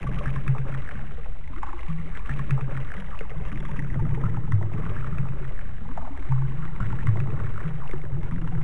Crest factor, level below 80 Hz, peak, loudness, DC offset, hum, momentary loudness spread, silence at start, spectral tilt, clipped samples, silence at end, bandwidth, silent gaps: 16 dB; -32 dBFS; -8 dBFS; -30 LUFS; 8%; none; 11 LU; 0 s; -9 dB/octave; under 0.1%; 0 s; 4.2 kHz; none